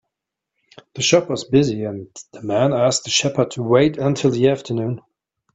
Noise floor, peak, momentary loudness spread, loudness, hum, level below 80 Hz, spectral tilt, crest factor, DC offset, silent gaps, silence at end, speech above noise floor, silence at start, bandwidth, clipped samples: -82 dBFS; 0 dBFS; 15 LU; -18 LUFS; none; -56 dBFS; -4.5 dB/octave; 18 dB; under 0.1%; none; 0.55 s; 64 dB; 0.95 s; 8.4 kHz; under 0.1%